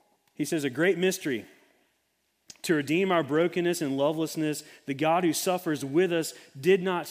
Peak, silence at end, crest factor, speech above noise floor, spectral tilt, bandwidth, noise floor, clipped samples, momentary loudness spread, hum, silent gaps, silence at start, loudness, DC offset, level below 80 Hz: -10 dBFS; 0 s; 18 dB; 48 dB; -5 dB/octave; 16 kHz; -74 dBFS; under 0.1%; 9 LU; none; none; 0.4 s; -27 LUFS; under 0.1%; -76 dBFS